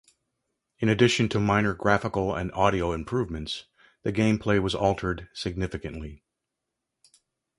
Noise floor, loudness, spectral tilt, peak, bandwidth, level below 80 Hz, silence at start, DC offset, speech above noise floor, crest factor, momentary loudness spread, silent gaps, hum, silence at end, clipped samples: -84 dBFS; -26 LUFS; -6 dB/octave; -4 dBFS; 11.5 kHz; -46 dBFS; 0.8 s; under 0.1%; 59 dB; 22 dB; 13 LU; none; none; 1.4 s; under 0.1%